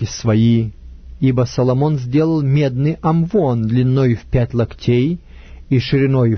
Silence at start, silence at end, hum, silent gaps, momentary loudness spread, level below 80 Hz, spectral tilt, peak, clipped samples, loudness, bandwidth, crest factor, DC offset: 0 s; 0 s; none; none; 5 LU; -38 dBFS; -8 dB/octave; -2 dBFS; under 0.1%; -16 LUFS; 6.6 kHz; 14 dB; under 0.1%